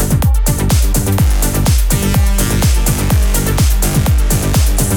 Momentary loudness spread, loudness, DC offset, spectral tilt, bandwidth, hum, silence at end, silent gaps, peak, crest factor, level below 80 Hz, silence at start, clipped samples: 1 LU; -13 LUFS; under 0.1%; -5 dB/octave; 19 kHz; none; 0 s; none; -2 dBFS; 10 dB; -14 dBFS; 0 s; under 0.1%